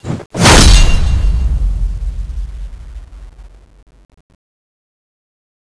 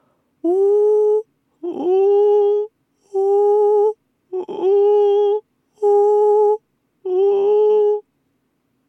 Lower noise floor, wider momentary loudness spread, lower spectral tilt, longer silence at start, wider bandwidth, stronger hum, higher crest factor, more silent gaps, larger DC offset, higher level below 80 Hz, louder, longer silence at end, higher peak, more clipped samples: second, -30 dBFS vs -67 dBFS; first, 25 LU vs 13 LU; second, -3.5 dB/octave vs -6 dB/octave; second, 0.05 s vs 0.45 s; first, 11 kHz vs 3.5 kHz; neither; about the same, 14 dB vs 10 dB; first, 0.26-0.30 s vs none; neither; first, -16 dBFS vs -86 dBFS; first, -12 LUFS vs -16 LUFS; first, 2.2 s vs 0.9 s; first, 0 dBFS vs -8 dBFS; neither